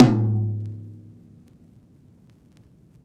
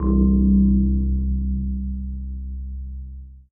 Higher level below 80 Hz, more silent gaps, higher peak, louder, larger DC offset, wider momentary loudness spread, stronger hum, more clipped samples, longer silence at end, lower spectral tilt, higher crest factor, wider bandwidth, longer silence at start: second, -56 dBFS vs -24 dBFS; neither; first, -2 dBFS vs -6 dBFS; about the same, -23 LUFS vs -21 LUFS; neither; first, 27 LU vs 18 LU; neither; neither; first, 2.1 s vs 0.1 s; second, -9 dB/octave vs -15 dB/octave; first, 22 dB vs 14 dB; first, 7.8 kHz vs 1.2 kHz; about the same, 0 s vs 0 s